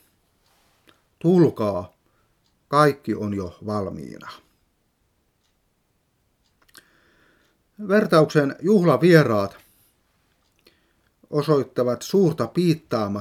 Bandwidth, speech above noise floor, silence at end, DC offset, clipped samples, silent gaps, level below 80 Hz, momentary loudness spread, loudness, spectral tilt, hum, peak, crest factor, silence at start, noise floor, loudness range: 15.5 kHz; 49 dB; 0 s; under 0.1%; under 0.1%; none; -64 dBFS; 15 LU; -21 LUFS; -7 dB/octave; none; 0 dBFS; 22 dB; 1.25 s; -69 dBFS; 12 LU